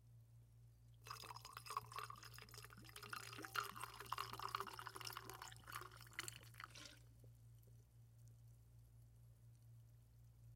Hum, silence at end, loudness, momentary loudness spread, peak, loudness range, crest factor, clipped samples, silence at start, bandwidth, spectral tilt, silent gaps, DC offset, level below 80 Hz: none; 0 s; -52 LUFS; 19 LU; -28 dBFS; 14 LU; 28 dB; under 0.1%; 0 s; 16.5 kHz; -2.5 dB/octave; none; under 0.1%; -74 dBFS